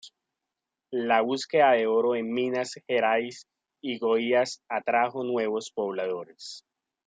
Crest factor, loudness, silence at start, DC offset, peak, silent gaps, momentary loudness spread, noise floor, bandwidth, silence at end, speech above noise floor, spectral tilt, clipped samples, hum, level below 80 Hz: 20 dB; -26 LUFS; 0.05 s; under 0.1%; -8 dBFS; none; 16 LU; -87 dBFS; 9.4 kHz; 0.5 s; 61 dB; -4 dB/octave; under 0.1%; none; -82 dBFS